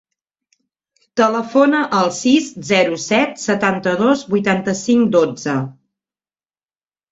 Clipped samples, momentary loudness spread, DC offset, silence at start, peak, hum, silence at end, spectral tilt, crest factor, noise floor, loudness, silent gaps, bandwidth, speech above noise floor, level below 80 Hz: under 0.1%; 5 LU; under 0.1%; 1.15 s; -2 dBFS; none; 1.4 s; -4.5 dB/octave; 16 dB; under -90 dBFS; -16 LUFS; none; 8 kHz; over 74 dB; -60 dBFS